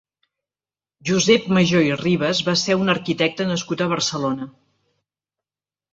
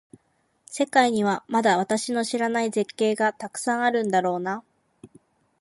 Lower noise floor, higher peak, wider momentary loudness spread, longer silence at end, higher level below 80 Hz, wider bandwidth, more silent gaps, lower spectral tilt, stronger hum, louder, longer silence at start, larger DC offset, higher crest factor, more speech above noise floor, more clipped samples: first, under -90 dBFS vs -69 dBFS; about the same, -2 dBFS vs -4 dBFS; about the same, 9 LU vs 8 LU; first, 1.45 s vs 0.55 s; first, -58 dBFS vs -72 dBFS; second, 8 kHz vs 11.5 kHz; neither; about the same, -4.5 dB/octave vs -4 dB/octave; first, 50 Hz at -55 dBFS vs none; first, -19 LUFS vs -24 LUFS; first, 1.05 s vs 0.7 s; neither; about the same, 20 dB vs 20 dB; first, over 71 dB vs 46 dB; neither